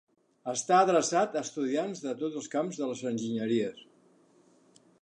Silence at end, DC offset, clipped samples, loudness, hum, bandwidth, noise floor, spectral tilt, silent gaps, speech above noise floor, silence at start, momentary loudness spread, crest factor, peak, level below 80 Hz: 1.25 s; under 0.1%; under 0.1%; -30 LUFS; none; 11 kHz; -63 dBFS; -4 dB/octave; none; 34 dB; 0.45 s; 11 LU; 20 dB; -10 dBFS; -82 dBFS